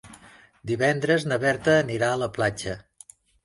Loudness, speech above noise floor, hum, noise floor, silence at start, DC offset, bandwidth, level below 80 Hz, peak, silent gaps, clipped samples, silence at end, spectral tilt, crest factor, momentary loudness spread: -24 LUFS; 29 dB; none; -52 dBFS; 0.05 s; under 0.1%; 11.5 kHz; -56 dBFS; -6 dBFS; none; under 0.1%; 0.65 s; -5 dB/octave; 18 dB; 13 LU